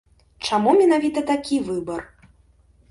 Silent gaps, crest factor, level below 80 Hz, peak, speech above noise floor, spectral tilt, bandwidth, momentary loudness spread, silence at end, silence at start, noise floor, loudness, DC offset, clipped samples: none; 16 dB; -54 dBFS; -6 dBFS; 36 dB; -5 dB/octave; 11.5 kHz; 14 LU; 0.85 s; 0.4 s; -56 dBFS; -20 LUFS; under 0.1%; under 0.1%